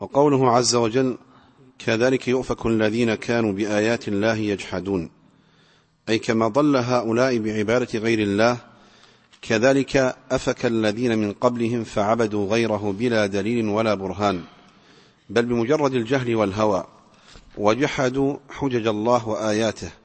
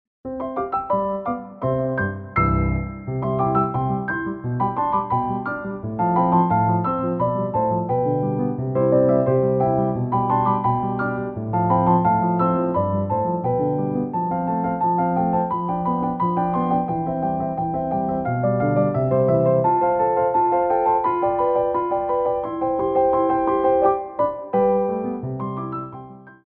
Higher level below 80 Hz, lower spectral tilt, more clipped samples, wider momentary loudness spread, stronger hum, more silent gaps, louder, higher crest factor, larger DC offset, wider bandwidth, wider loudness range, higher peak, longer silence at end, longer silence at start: second, -52 dBFS vs -44 dBFS; second, -5.5 dB/octave vs -12.5 dB/octave; neither; about the same, 7 LU vs 8 LU; neither; neither; about the same, -22 LUFS vs -21 LUFS; about the same, 20 dB vs 16 dB; neither; first, 8.8 kHz vs 4.3 kHz; about the same, 2 LU vs 3 LU; about the same, -2 dBFS vs -4 dBFS; about the same, 0.1 s vs 0.1 s; second, 0 s vs 0.25 s